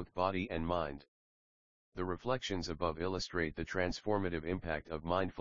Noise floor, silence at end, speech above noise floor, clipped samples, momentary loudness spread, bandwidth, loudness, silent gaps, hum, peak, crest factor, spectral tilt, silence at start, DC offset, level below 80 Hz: under -90 dBFS; 0 s; over 53 dB; under 0.1%; 5 LU; 7.4 kHz; -37 LUFS; 1.08-1.92 s; none; -18 dBFS; 20 dB; -4.5 dB/octave; 0 s; 0.2%; -54 dBFS